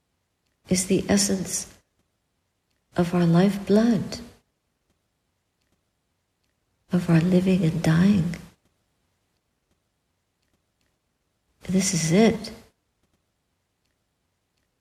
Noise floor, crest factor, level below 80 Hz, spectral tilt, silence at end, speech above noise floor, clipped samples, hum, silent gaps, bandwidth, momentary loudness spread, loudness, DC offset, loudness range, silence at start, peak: -75 dBFS; 20 dB; -54 dBFS; -5.5 dB/octave; 2.25 s; 54 dB; under 0.1%; none; none; 14.5 kHz; 14 LU; -22 LUFS; under 0.1%; 6 LU; 0.7 s; -6 dBFS